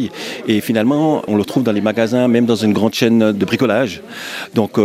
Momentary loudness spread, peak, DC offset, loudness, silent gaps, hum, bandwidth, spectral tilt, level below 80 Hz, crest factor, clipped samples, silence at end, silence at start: 9 LU; 0 dBFS; under 0.1%; -16 LUFS; none; none; 16 kHz; -6 dB/octave; -58 dBFS; 14 dB; under 0.1%; 0 s; 0 s